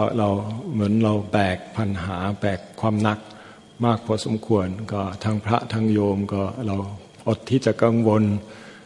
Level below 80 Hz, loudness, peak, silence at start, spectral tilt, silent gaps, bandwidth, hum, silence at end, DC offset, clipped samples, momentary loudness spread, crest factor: -58 dBFS; -23 LUFS; -2 dBFS; 0 s; -7.5 dB/octave; none; 11 kHz; none; 0 s; under 0.1%; under 0.1%; 9 LU; 20 dB